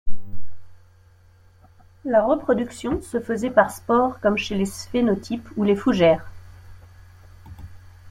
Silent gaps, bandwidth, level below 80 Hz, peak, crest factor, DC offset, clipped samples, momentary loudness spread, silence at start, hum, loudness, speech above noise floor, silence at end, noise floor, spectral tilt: none; 16.5 kHz; -44 dBFS; -2 dBFS; 20 dB; under 0.1%; under 0.1%; 17 LU; 0.05 s; none; -22 LUFS; 32 dB; 0 s; -53 dBFS; -6 dB/octave